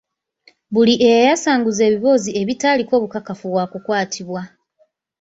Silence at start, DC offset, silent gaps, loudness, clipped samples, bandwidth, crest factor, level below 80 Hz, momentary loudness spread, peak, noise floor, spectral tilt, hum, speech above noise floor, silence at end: 0.7 s; under 0.1%; none; -17 LUFS; under 0.1%; 8 kHz; 16 dB; -60 dBFS; 14 LU; -2 dBFS; -61 dBFS; -4 dB/octave; none; 45 dB; 0.75 s